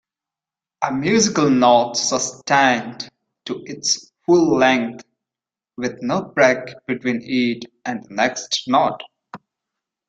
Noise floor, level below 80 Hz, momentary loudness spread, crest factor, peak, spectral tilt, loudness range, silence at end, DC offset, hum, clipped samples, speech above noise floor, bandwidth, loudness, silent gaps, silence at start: -89 dBFS; -62 dBFS; 15 LU; 18 dB; -2 dBFS; -3.5 dB/octave; 4 LU; 0.7 s; under 0.1%; none; under 0.1%; 71 dB; 9.4 kHz; -19 LUFS; none; 0.8 s